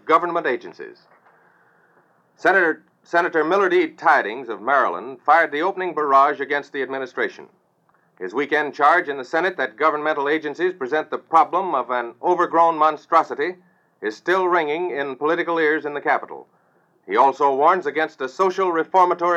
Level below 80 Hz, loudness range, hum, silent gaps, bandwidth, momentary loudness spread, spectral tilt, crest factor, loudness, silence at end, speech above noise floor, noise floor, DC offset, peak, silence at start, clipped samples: -86 dBFS; 3 LU; none; none; 8.2 kHz; 10 LU; -5 dB/octave; 18 dB; -20 LUFS; 0 s; 42 dB; -62 dBFS; under 0.1%; -2 dBFS; 0.05 s; under 0.1%